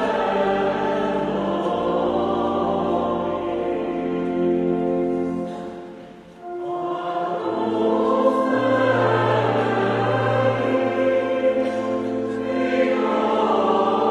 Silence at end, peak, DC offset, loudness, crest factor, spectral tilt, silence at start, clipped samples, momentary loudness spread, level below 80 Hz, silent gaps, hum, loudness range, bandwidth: 0 s; -6 dBFS; under 0.1%; -21 LUFS; 16 dB; -7.5 dB/octave; 0 s; under 0.1%; 7 LU; -54 dBFS; none; none; 5 LU; 10 kHz